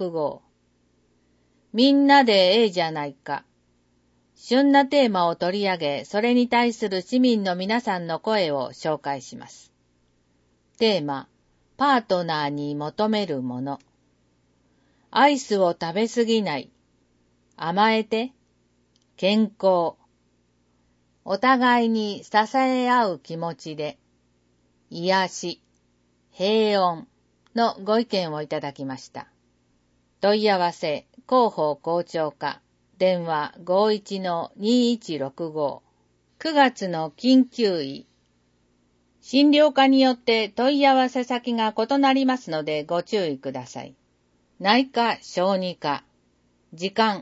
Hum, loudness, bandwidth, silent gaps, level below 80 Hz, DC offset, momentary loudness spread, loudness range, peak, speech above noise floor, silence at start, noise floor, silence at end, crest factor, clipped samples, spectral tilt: 60 Hz at -55 dBFS; -22 LUFS; 8 kHz; none; -70 dBFS; under 0.1%; 14 LU; 6 LU; -4 dBFS; 44 dB; 0 s; -66 dBFS; 0 s; 20 dB; under 0.1%; -5 dB/octave